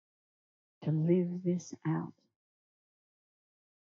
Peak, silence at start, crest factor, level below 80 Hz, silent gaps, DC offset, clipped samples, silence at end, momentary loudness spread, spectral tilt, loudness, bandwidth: -16 dBFS; 0.8 s; 20 dB; -86 dBFS; none; under 0.1%; under 0.1%; 1.7 s; 10 LU; -9.5 dB/octave; -33 LUFS; 7.4 kHz